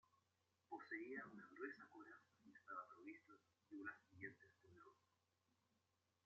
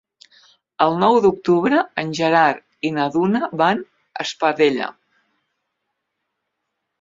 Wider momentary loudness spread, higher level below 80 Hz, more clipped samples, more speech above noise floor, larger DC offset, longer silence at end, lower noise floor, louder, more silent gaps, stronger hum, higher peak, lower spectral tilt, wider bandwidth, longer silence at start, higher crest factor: about the same, 13 LU vs 11 LU; second, under -90 dBFS vs -62 dBFS; neither; second, 29 dB vs 60 dB; neither; second, 1.3 s vs 2.1 s; first, -88 dBFS vs -77 dBFS; second, -57 LUFS vs -18 LUFS; neither; neither; second, -38 dBFS vs -2 dBFS; about the same, -4.5 dB/octave vs -5.5 dB/octave; about the same, 7.2 kHz vs 7.8 kHz; second, 0.15 s vs 0.8 s; about the same, 22 dB vs 18 dB